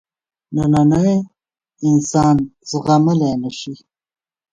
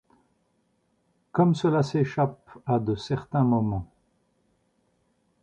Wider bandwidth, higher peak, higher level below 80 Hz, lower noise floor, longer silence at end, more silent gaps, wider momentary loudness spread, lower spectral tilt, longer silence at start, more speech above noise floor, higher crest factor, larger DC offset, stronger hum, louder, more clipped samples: about the same, 9.8 kHz vs 9 kHz; first, -2 dBFS vs -10 dBFS; first, -46 dBFS vs -54 dBFS; second, -60 dBFS vs -70 dBFS; second, 0.75 s vs 1.6 s; neither; first, 13 LU vs 8 LU; about the same, -7 dB/octave vs -8 dB/octave; second, 0.5 s vs 1.35 s; about the same, 45 dB vs 46 dB; about the same, 16 dB vs 18 dB; neither; second, none vs 60 Hz at -45 dBFS; first, -16 LUFS vs -25 LUFS; neither